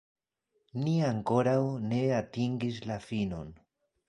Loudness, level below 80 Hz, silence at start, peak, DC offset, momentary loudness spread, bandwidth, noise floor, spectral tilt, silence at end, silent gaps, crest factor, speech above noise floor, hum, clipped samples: -31 LUFS; -60 dBFS; 0.75 s; -12 dBFS; under 0.1%; 10 LU; 11 kHz; -79 dBFS; -7.5 dB/octave; 0.55 s; none; 20 dB; 49 dB; none; under 0.1%